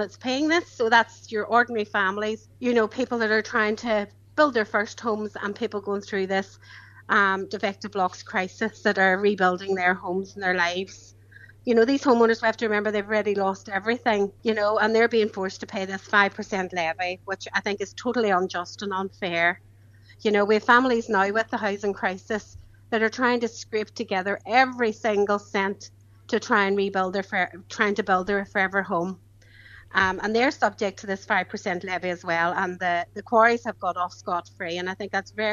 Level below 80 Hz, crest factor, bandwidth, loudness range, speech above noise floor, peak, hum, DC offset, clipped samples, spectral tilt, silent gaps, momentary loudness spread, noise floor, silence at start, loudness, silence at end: -60 dBFS; 22 dB; 7.6 kHz; 3 LU; 27 dB; -2 dBFS; none; under 0.1%; under 0.1%; -4.5 dB/octave; none; 10 LU; -51 dBFS; 0 s; -24 LUFS; 0 s